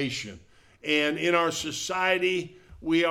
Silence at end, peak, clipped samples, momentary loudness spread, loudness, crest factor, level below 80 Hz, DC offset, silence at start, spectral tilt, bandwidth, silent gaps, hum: 0 s; -8 dBFS; under 0.1%; 14 LU; -26 LUFS; 20 dB; -58 dBFS; under 0.1%; 0 s; -3.5 dB/octave; 16 kHz; none; none